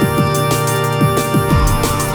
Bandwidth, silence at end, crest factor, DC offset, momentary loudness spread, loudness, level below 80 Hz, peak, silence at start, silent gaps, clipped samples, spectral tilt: over 20 kHz; 0 s; 10 dB; under 0.1%; 2 LU; -15 LUFS; -24 dBFS; -4 dBFS; 0 s; none; under 0.1%; -5 dB/octave